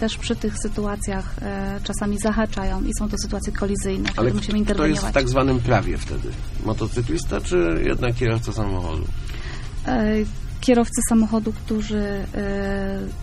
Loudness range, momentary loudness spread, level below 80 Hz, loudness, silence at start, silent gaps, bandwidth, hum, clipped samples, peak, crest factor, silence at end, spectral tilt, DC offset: 3 LU; 10 LU; -28 dBFS; -23 LUFS; 0 s; none; 13.5 kHz; none; under 0.1%; -4 dBFS; 18 dB; 0 s; -5.5 dB/octave; under 0.1%